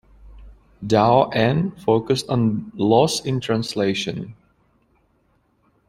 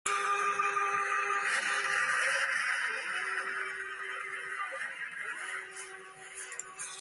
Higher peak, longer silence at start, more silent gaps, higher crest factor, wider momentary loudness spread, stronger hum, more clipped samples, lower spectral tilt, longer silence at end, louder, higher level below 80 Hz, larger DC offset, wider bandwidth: first, -2 dBFS vs -16 dBFS; first, 0.25 s vs 0.05 s; neither; about the same, 20 dB vs 18 dB; second, 10 LU vs 13 LU; neither; neither; first, -6 dB/octave vs 0.5 dB/octave; first, 1.55 s vs 0 s; first, -20 LUFS vs -32 LUFS; first, -50 dBFS vs -78 dBFS; neither; first, 16 kHz vs 11.5 kHz